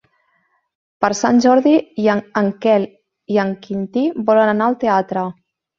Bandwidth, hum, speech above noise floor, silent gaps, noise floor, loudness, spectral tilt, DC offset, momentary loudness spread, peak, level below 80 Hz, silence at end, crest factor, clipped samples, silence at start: 7.6 kHz; none; 48 dB; none; -64 dBFS; -17 LUFS; -5.5 dB/octave; under 0.1%; 10 LU; 0 dBFS; -62 dBFS; 0.45 s; 16 dB; under 0.1%; 1 s